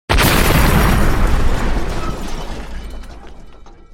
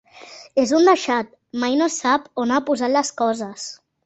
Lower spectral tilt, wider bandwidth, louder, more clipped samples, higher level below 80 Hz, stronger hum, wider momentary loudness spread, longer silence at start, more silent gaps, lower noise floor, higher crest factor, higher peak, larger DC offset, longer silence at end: first, -4.5 dB/octave vs -3 dB/octave; first, 17.5 kHz vs 8.2 kHz; first, -16 LUFS vs -20 LUFS; neither; first, -18 dBFS vs -64 dBFS; neither; first, 20 LU vs 15 LU; about the same, 0.1 s vs 0.15 s; neither; second, -36 dBFS vs -43 dBFS; about the same, 14 dB vs 18 dB; about the same, 0 dBFS vs -2 dBFS; neither; about the same, 0.25 s vs 0.3 s